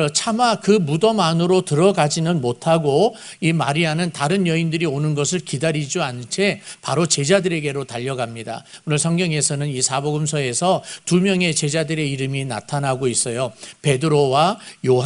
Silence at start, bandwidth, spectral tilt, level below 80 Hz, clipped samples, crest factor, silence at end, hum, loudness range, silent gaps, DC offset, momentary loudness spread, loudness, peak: 0 s; 11 kHz; -4.5 dB/octave; -58 dBFS; under 0.1%; 20 dB; 0 s; none; 3 LU; none; under 0.1%; 8 LU; -19 LUFS; 0 dBFS